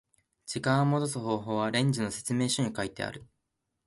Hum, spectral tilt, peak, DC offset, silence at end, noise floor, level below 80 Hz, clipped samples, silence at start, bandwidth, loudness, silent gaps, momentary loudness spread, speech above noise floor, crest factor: none; -5 dB/octave; -12 dBFS; under 0.1%; 0.6 s; -82 dBFS; -64 dBFS; under 0.1%; 0.45 s; 11.5 kHz; -30 LUFS; none; 11 LU; 53 dB; 18 dB